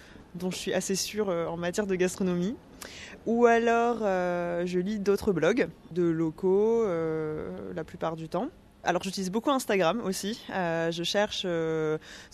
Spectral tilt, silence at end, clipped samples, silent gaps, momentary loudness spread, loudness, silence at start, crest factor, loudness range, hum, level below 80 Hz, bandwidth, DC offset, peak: -5 dB/octave; 0.05 s; under 0.1%; none; 11 LU; -28 LUFS; 0 s; 20 dB; 4 LU; none; -58 dBFS; 13.5 kHz; under 0.1%; -10 dBFS